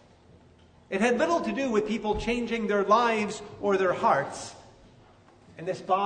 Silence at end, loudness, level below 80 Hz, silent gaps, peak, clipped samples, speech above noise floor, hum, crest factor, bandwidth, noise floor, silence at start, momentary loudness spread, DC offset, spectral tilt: 0 s; -26 LUFS; -52 dBFS; none; -8 dBFS; under 0.1%; 30 dB; none; 20 dB; 9.6 kHz; -56 dBFS; 0.9 s; 13 LU; under 0.1%; -5 dB/octave